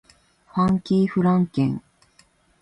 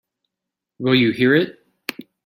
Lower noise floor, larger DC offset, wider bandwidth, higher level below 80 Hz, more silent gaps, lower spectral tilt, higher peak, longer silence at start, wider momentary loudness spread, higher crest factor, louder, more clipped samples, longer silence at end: second, -59 dBFS vs -84 dBFS; neither; second, 8.4 kHz vs 16.5 kHz; first, -54 dBFS vs -60 dBFS; neither; first, -9 dB/octave vs -6.5 dB/octave; second, -8 dBFS vs -2 dBFS; second, 0.55 s vs 0.8 s; second, 8 LU vs 16 LU; about the same, 14 dB vs 18 dB; second, -22 LUFS vs -18 LUFS; neither; first, 0.8 s vs 0.25 s